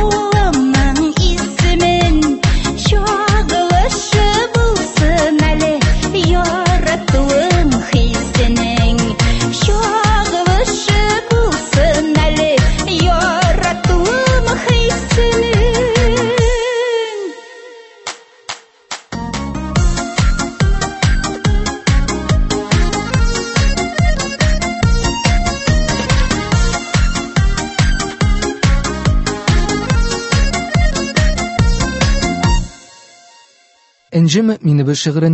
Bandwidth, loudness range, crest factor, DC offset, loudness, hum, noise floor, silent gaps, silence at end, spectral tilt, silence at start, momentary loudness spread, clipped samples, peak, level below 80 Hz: 8.6 kHz; 4 LU; 14 dB; under 0.1%; -14 LUFS; none; -53 dBFS; none; 0 s; -5 dB/octave; 0 s; 4 LU; under 0.1%; 0 dBFS; -18 dBFS